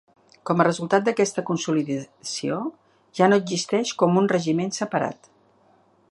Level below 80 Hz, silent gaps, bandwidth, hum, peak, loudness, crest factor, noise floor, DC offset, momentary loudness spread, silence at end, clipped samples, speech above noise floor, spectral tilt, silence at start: -72 dBFS; none; 11.5 kHz; none; -2 dBFS; -23 LUFS; 22 dB; -59 dBFS; under 0.1%; 11 LU; 0.95 s; under 0.1%; 37 dB; -5 dB/octave; 0.45 s